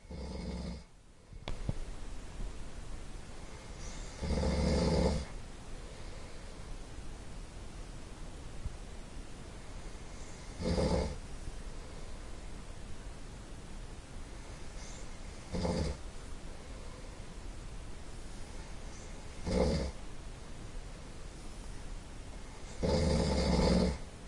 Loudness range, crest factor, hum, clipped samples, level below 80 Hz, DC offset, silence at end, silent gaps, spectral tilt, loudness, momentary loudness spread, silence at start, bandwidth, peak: 12 LU; 22 dB; none; under 0.1%; -42 dBFS; under 0.1%; 0 s; none; -6 dB/octave; -40 LUFS; 18 LU; 0 s; 11.5 kHz; -16 dBFS